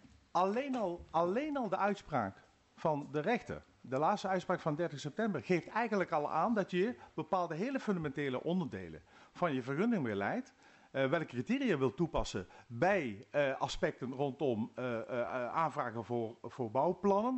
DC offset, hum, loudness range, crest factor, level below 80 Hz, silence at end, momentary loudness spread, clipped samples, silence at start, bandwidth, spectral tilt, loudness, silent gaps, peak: under 0.1%; none; 2 LU; 16 dB; -60 dBFS; 0 s; 7 LU; under 0.1%; 0.35 s; 8.2 kHz; -6.5 dB/octave; -36 LUFS; none; -20 dBFS